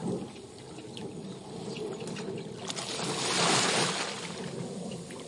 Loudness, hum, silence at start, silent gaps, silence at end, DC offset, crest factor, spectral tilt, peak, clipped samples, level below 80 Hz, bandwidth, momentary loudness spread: -32 LUFS; none; 0 s; none; 0 s; under 0.1%; 22 dB; -2.5 dB/octave; -12 dBFS; under 0.1%; -70 dBFS; 11.5 kHz; 18 LU